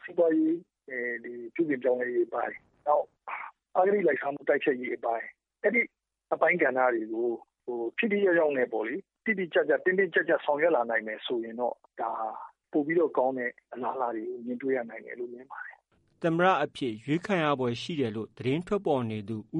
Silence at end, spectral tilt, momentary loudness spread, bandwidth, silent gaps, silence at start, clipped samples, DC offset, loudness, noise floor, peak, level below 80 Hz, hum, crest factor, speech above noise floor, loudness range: 0 s; -7 dB/octave; 13 LU; 9.6 kHz; none; 0.05 s; under 0.1%; under 0.1%; -29 LUFS; -61 dBFS; -8 dBFS; -72 dBFS; none; 20 dB; 33 dB; 4 LU